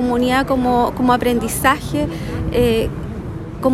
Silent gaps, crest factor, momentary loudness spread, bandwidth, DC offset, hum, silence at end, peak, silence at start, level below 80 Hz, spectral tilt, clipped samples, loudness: none; 16 dB; 11 LU; 16 kHz; under 0.1%; none; 0 s; -2 dBFS; 0 s; -32 dBFS; -5.5 dB/octave; under 0.1%; -18 LUFS